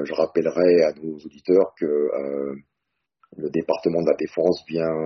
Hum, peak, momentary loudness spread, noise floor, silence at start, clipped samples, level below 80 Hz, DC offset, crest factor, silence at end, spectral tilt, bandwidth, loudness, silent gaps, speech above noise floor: none; -6 dBFS; 15 LU; -80 dBFS; 0 s; under 0.1%; -64 dBFS; under 0.1%; 16 dB; 0 s; -6 dB/octave; 6.4 kHz; -22 LUFS; none; 58 dB